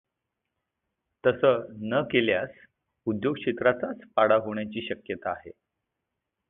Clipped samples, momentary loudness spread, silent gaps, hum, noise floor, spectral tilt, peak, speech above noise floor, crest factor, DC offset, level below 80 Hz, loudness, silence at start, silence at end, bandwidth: under 0.1%; 12 LU; none; none; -84 dBFS; -9.5 dB/octave; -8 dBFS; 58 dB; 20 dB; under 0.1%; -64 dBFS; -27 LUFS; 1.25 s; 1 s; 4 kHz